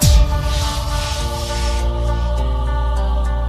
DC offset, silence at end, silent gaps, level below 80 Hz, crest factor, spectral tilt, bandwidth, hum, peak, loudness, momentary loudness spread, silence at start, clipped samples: under 0.1%; 0 s; none; -18 dBFS; 16 dB; -4.5 dB/octave; 15 kHz; none; -2 dBFS; -20 LUFS; 4 LU; 0 s; under 0.1%